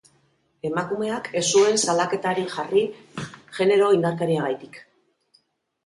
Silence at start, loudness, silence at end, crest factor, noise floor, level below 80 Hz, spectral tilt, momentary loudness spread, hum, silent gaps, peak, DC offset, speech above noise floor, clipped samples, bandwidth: 0.65 s; -22 LUFS; 1.05 s; 16 dB; -65 dBFS; -68 dBFS; -4 dB/octave; 17 LU; none; none; -6 dBFS; under 0.1%; 43 dB; under 0.1%; 11.5 kHz